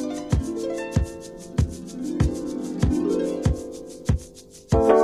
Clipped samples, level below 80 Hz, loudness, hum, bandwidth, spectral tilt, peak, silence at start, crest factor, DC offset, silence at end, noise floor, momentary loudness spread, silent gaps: under 0.1%; -32 dBFS; -26 LUFS; none; 13.5 kHz; -7.5 dB/octave; -4 dBFS; 0 s; 20 dB; under 0.1%; 0 s; -45 dBFS; 10 LU; none